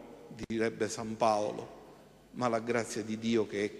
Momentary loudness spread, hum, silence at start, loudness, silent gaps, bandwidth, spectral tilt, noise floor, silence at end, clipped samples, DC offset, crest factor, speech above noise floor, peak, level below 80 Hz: 19 LU; none; 0 s; -33 LUFS; none; 13 kHz; -5 dB/octave; -56 dBFS; 0 s; under 0.1%; under 0.1%; 20 dB; 23 dB; -14 dBFS; -66 dBFS